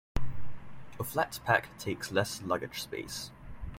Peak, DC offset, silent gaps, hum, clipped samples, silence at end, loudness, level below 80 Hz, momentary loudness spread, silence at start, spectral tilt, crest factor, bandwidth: -12 dBFS; under 0.1%; none; none; under 0.1%; 0 s; -34 LUFS; -46 dBFS; 18 LU; 0.15 s; -4 dB/octave; 20 dB; 16.5 kHz